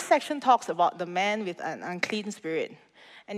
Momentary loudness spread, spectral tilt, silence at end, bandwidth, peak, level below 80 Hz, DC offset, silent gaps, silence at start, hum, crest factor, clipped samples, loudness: 10 LU; -4 dB/octave; 0 s; 14.5 kHz; -8 dBFS; -82 dBFS; under 0.1%; none; 0 s; none; 20 dB; under 0.1%; -28 LUFS